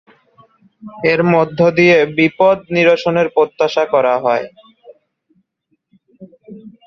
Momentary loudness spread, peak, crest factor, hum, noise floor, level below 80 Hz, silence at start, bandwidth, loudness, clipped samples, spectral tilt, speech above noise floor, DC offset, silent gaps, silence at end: 6 LU; 0 dBFS; 16 dB; none; -67 dBFS; -58 dBFS; 0.85 s; 7 kHz; -13 LUFS; under 0.1%; -6.5 dB/octave; 54 dB; under 0.1%; none; 0.15 s